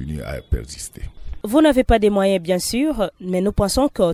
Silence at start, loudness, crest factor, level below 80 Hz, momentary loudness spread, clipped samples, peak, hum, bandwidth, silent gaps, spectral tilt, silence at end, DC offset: 0 s; -19 LUFS; 16 dB; -30 dBFS; 17 LU; under 0.1%; -4 dBFS; none; 16 kHz; none; -5.5 dB/octave; 0 s; under 0.1%